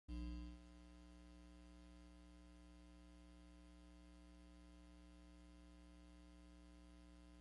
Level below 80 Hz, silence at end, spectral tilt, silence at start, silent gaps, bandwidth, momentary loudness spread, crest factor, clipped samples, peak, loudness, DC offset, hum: -62 dBFS; 0 s; -6 dB/octave; 0.1 s; none; 11 kHz; 8 LU; 20 dB; under 0.1%; -40 dBFS; -62 LUFS; under 0.1%; 60 Hz at -65 dBFS